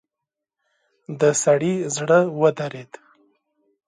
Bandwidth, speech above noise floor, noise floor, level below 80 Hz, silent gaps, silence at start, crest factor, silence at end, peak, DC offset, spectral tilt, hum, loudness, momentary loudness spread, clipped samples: 11.5 kHz; 66 dB; -85 dBFS; -70 dBFS; none; 1.1 s; 18 dB; 1.05 s; -4 dBFS; under 0.1%; -5 dB/octave; none; -20 LUFS; 15 LU; under 0.1%